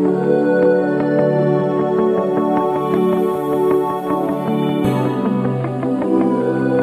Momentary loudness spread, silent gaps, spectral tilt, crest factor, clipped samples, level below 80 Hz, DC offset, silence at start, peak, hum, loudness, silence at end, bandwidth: 4 LU; none; -8.5 dB/octave; 14 dB; under 0.1%; -54 dBFS; under 0.1%; 0 s; -2 dBFS; none; -17 LUFS; 0 s; 14 kHz